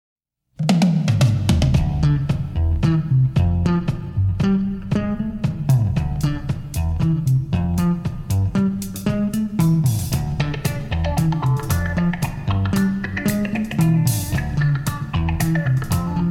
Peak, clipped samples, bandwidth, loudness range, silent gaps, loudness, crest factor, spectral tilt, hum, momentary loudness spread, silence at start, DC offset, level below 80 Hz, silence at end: -4 dBFS; under 0.1%; 17 kHz; 3 LU; none; -20 LUFS; 14 dB; -6.5 dB/octave; none; 6 LU; 0.6 s; under 0.1%; -30 dBFS; 0 s